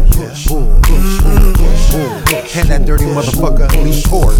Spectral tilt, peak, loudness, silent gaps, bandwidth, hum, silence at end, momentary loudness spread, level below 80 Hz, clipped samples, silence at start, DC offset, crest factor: -5.5 dB/octave; 0 dBFS; -13 LUFS; none; 17.5 kHz; none; 0 s; 3 LU; -8 dBFS; under 0.1%; 0 s; under 0.1%; 8 dB